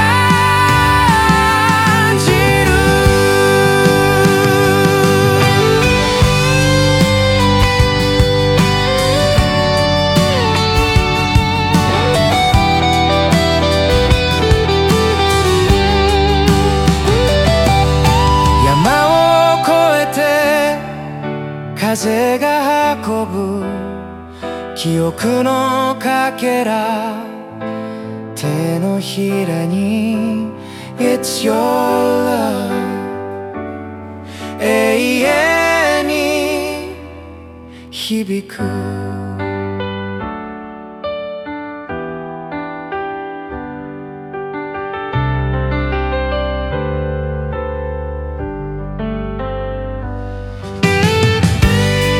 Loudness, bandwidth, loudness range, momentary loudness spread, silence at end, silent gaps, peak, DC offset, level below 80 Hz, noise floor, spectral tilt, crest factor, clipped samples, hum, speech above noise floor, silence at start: -14 LUFS; 17 kHz; 12 LU; 15 LU; 0 s; none; 0 dBFS; under 0.1%; -26 dBFS; -34 dBFS; -5 dB/octave; 14 dB; under 0.1%; none; 19 dB; 0 s